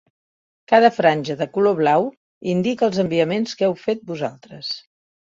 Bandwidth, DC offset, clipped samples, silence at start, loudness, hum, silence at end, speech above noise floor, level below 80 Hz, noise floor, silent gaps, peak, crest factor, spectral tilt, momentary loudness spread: 7.6 kHz; under 0.1%; under 0.1%; 0.7 s; -20 LUFS; none; 0.45 s; over 71 dB; -64 dBFS; under -90 dBFS; 2.17-2.41 s; 0 dBFS; 20 dB; -6 dB/octave; 14 LU